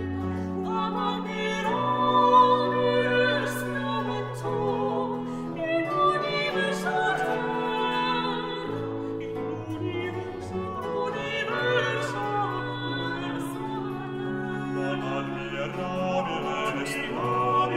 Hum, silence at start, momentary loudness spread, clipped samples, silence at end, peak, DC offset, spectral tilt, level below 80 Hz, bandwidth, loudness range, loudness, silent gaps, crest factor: none; 0 s; 9 LU; under 0.1%; 0 s; -8 dBFS; under 0.1%; -5.5 dB/octave; -56 dBFS; 16 kHz; 7 LU; -27 LUFS; none; 20 dB